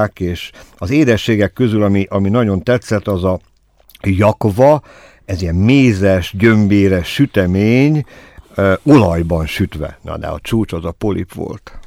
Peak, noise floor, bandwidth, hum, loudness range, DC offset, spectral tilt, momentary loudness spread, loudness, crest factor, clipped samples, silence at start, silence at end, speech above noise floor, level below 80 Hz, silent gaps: 0 dBFS; -47 dBFS; 15.5 kHz; none; 3 LU; under 0.1%; -7.5 dB/octave; 15 LU; -14 LUFS; 14 dB; under 0.1%; 0 s; 0.05 s; 34 dB; -36 dBFS; none